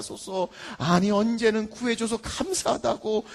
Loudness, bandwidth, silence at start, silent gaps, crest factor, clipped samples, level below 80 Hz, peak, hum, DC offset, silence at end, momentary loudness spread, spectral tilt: -26 LUFS; 12.5 kHz; 0 s; none; 18 dB; under 0.1%; -52 dBFS; -8 dBFS; none; under 0.1%; 0 s; 9 LU; -4.5 dB/octave